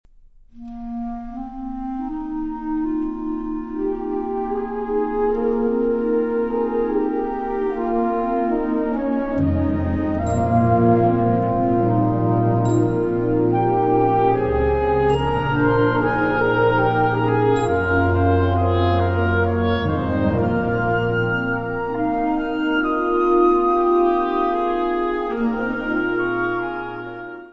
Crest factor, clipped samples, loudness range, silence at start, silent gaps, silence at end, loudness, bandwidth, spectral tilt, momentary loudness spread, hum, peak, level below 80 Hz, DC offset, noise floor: 14 dB; under 0.1%; 6 LU; 0.55 s; none; 0 s; -20 LUFS; 7.8 kHz; -8.5 dB/octave; 10 LU; none; -4 dBFS; -38 dBFS; 0.1%; -48 dBFS